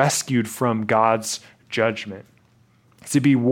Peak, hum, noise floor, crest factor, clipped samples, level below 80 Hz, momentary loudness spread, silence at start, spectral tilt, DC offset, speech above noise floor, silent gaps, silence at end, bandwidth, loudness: -2 dBFS; none; -58 dBFS; 20 dB; under 0.1%; -66 dBFS; 15 LU; 0 s; -5 dB/octave; under 0.1%; 37 dB; none; 0 s; 17 kHz; -21 LUFS